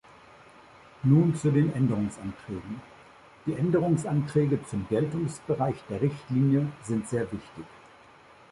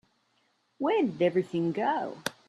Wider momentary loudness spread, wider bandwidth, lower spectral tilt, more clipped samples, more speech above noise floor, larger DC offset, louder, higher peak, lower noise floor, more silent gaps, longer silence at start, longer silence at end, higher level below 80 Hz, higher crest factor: first, 15 LU vs 6 LU; second, 11.5 kHz vs 14 kHz; first, -8.5 dB/octave vs -6 dB/octave; neither; second, 27 dB vs 44 dB; neither; about the same, -27 LUFS vs -29 LUFS; about the same, -10 dBFS vs -10 dBFS; second, -54 dBFS vs -72 dBFS; neither; first, 1.05 s vs 0.8 s; first, 0.75 s vs 0.15 s; first, -58 dBFS vs -76 dBFS; about the same, 18 dB vs 20 dB